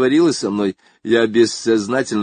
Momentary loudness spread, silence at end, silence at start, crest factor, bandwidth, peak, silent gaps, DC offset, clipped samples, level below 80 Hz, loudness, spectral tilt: 8 LU; 0 s; 0 s; 14 dB; 9.6 kHz; -2 dBFS; none; under 0.1%; under 0.1%; -58 dBFS; -17 LUFS; -4.5 dB/octave